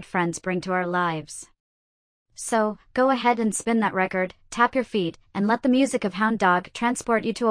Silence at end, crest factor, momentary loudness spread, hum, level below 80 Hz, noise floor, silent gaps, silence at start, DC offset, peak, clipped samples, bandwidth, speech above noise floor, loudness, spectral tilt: 0 s; 18 dB; 7 LU; none; -58 dBFS; under -90 dBFS; 1.60-2.26 s; 0 s; under 0.1%; -6 dBFS; under 0.1%; 10.5 kHz; over 67 dB; -24 LUFS; -4.5 dB/octave